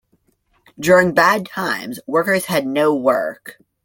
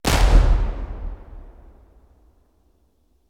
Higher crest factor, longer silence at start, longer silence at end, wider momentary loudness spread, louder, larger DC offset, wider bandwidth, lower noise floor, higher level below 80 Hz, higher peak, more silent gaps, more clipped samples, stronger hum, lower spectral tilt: about the same, 16 dB vs 18 dB; first, 0.8 s vs 0.05 s; second, 0.35 s vs 1.8 s; second, 11 LU vs 26 LU; first, -17 LUFS vs -21 LUFS; neither; first, 17 kHz vs 15 kHz; about the same, -63 dBFS vs -63 dBFS; second, -58 dBFS vs -22 dBFS; about the same, -2 dBFS vs -2 dBFS; neither; neither; neither; about the same, -4.5 dB/octave vs -5 dB/octave